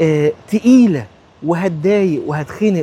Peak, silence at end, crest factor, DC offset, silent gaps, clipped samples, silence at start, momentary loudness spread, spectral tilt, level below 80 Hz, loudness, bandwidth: 0 dBFS; 0 s; 14 dB; under 0.1%; none; under 0.1%; 0 s; 11 LU; -7.5 dB/octave; -52 dBFS; -15 LUFS; 11.5 kHz